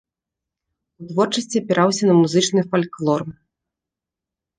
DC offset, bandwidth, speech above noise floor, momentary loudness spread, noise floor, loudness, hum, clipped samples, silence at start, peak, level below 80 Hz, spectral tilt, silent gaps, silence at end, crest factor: under 0.1%; 10 kHz; 68 dB; 8 LU; -87 dBFS; -19 LUFS; none; under 0.1%; 1 s; -4 dBFS; -64 dBFS; -5 dB/octave; none; 1.25 s; 18 dB